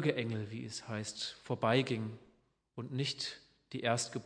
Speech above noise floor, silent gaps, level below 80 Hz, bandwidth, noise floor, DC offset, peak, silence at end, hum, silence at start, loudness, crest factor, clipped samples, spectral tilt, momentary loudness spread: 35 dB; none; -76 dBFS; 10.5 kHz; -71 dBFS; under 0.1%; -16 dBFS; 0 s; none; 0 s; -37 LUFS; 22 dB; under 0.1%; -4.5 dB/octave; 16 LU